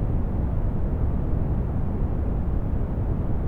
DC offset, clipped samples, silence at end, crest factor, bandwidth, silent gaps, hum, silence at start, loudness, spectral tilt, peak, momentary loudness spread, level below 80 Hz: under 0.1%; under 0.1%; 0 s; 12 dB; 3.3 kHz; none; none; 0 s; -27 LUFS; -11.5 dB/octave; -12 dBFS; 1 LU; -26 dBFS